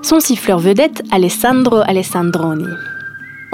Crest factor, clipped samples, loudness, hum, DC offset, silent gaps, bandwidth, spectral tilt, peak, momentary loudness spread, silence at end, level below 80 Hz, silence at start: 14 dB; under 0.1%; -13 LUFS; none; under 0.1%; none; 16.5 kHz; -4.5 dB/octave; 0 dBFS; 14 LU; 0 s; -50 dBFS; 0 s